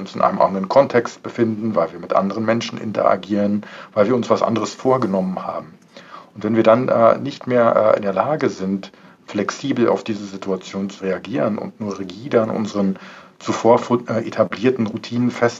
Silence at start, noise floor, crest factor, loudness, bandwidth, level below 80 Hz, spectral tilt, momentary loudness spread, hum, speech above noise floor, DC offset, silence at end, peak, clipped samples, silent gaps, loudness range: 0 s; -41 dBFS; 18 dB; -19 LUFS; 7.8 kHz; -68 dBFS; -6.5 dB/octave; 12 LU; none; 22 dB; under 0.1%; 0 s; -2 dBFS; under 0.1%; none; 5 LU